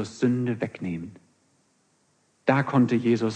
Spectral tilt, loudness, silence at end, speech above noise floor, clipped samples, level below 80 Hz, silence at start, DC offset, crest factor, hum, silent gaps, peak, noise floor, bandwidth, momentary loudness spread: -7.5 dB/octave; -25 LUFS; 0 s; 43 dB; under 0.1%; -68 dBFS; 0 s; under 0.1%; 20 dB; none; none; -6 dBFS; -67 dBFS; 9.2 kHz; 12 LU